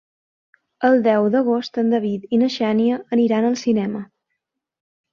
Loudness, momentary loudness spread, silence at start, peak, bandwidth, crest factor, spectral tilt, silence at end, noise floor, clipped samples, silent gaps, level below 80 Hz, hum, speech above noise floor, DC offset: -19 LUFS; 5 LU; 0.8 s; -4 dBFS; 7 kHz; 16 dB; -6.5 dB/octave; 1.1 s; -78 dBFS; under 0.1%; none; -66 dBFS; none; 60 dB; under 0.1%